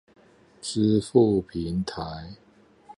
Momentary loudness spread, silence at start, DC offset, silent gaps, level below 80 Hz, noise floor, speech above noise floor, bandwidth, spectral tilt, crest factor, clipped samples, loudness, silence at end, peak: 17 LU; 0.65 s; under 0.1%; none; -50 dBFS; -52 dBFS; 28 dB; 11 kHz; -6.5 dB/octave; 20 dB; under 0.1%; -25 LUFS; 0.05 s; -6 dBFS